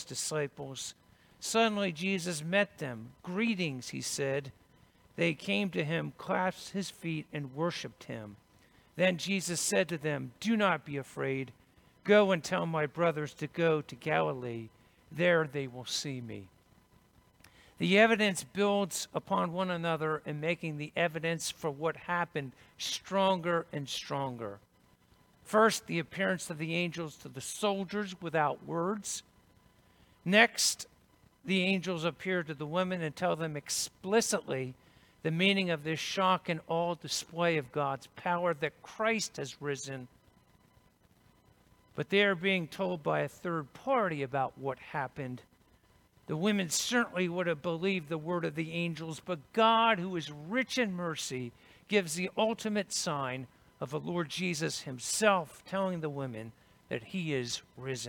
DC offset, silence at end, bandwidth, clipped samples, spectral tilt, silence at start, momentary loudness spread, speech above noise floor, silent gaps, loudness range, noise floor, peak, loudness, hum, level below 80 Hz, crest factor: under 0.1%; 0 s; 19 kHz; under 0.1%; -4 dB/octave; 0 s; 13 LU; 33 dB; none; 4 LU; -66 dBFS; -8 dBFS; -32 LUFS; none; -72 dBFS; 24 dB